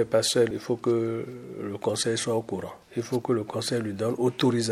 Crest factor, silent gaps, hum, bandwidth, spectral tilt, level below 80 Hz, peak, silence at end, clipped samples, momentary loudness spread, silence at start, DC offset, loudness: 16 dB; none; none; 15 kHz; -4.5 dB/octave; -66 dBFS; -10 dBFS; 0 s; under 0.1%; 11 LU; 0 s; under 0.1%; -27 LUFS